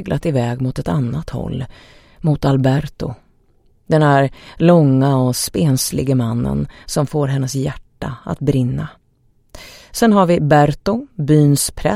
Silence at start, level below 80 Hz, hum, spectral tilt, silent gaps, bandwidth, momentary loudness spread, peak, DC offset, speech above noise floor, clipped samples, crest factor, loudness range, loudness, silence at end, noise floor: 0 s; -38 dBFS; none; -6 dB/octave; none; 16 kHz; 14 LU; 0 dBFS; under 0.1%; 41 dB; under 0.1%; 16 dB; 5 LU; -16 LUFS; 0 s; -56 dBFS